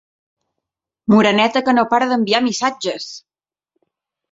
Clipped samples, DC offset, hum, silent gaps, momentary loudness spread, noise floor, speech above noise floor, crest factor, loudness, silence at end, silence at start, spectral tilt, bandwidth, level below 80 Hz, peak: under 0.1%; under 0.1%; none; none; 15 LU; -81 dBFS; 66 dB; 18 dB; -16 LUFS; 1.15 s; 1.1 s; -4.5 dB/octave; 7.8 kHz; -62 dBFS; -2 dBFS